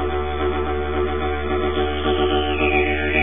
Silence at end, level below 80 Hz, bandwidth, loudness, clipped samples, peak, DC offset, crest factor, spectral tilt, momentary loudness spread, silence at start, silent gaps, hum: 0 s; -30 dBFS; 3.7 kHz; -21 LUFS; under 0.1%; -6 dBFS; 3%; 14 dB; -11 dB/octave; 5 LU; 0 s; none; none